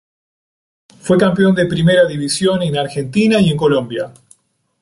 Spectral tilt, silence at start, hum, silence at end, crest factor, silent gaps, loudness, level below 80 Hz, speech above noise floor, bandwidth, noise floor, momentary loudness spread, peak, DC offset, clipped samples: -5.5 dB/octave; 1.05 s; none; 0.7 s; 14 dB; none; -14 LUFS; -48 dBFS; 39 dB; 11.5 kHz; -52 dBFS; 11 LU; -2 dBFS; under 0.1%; under 0.1%